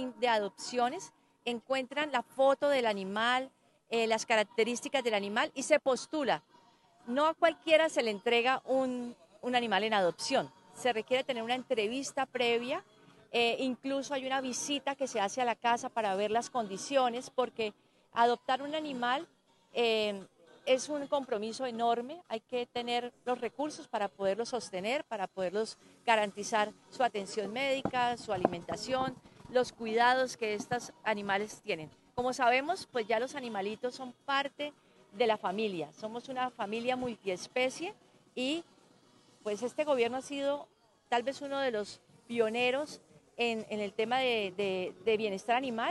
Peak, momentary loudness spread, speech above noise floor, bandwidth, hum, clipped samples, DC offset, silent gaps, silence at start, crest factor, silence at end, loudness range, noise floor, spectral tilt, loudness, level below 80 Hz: -8 dBFS; 10 LU; 31 dB; 12 kHz; none; under 0.1%; under 0.1%; none; 0 s; 24 dB; 0 s; 5 LU; -64 dBFS; -3 dB/octave; -33 LUFS; -74 dBFS